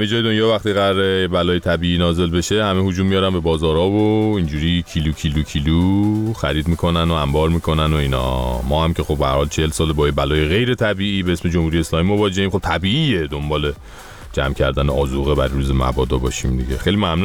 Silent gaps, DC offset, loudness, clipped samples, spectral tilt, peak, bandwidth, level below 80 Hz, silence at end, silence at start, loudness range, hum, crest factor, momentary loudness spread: none; under 0.1%; -18 LUFS; under 0.1%; -6 dB/octave; -4 dBFS; 17.5 kHz; -28 dBFS; 0 s; 0 s; 2 LU; none; 14 dB; 4 LU